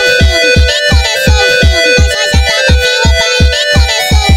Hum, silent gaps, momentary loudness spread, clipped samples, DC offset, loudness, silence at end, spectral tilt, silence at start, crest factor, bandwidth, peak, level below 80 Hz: none; none; 2 LU; 0.7%; under 0.1%; -8 LUFS; 0 s; -3.5 dB/octave; 0 s; 8 dB; 16 kHz; 0 dBFS; -12 dBFS